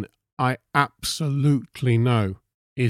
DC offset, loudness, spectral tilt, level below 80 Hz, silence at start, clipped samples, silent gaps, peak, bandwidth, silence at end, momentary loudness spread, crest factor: under 0.1%; -23 LUFS; -6 dB/octave; -54 dBFS; 0 s; under 0.1%; 0.33-0.37 s, 2.54-2.76 s; -4 dBFS; 15.5 kHz; 0 s; 14 LU; 18 dB